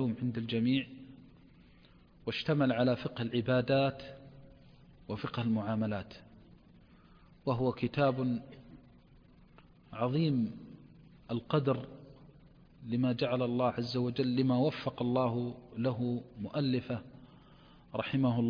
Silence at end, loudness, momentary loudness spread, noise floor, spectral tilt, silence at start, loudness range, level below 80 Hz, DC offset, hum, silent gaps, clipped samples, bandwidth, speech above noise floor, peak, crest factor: 0 s; -33 LUFS; 19 LU; -60 dBFS; -9 dB/octave; 0 s; 5 LU; -64 dBFS; under 0.1%; none; none; under 0.1%; 5.2 kHz; 28 dB; -16 dBFS; 18 dB